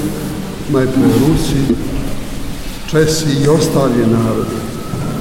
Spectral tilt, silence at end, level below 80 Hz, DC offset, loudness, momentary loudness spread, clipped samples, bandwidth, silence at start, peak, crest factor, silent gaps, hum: -6 dB/octave; 0 s; -28 dBFS; under 0.1%; -15 LUFS; 12 LU; under 0.1%; 16.5 kHz; 0 s; 0 dBFS; 14 dB; none; none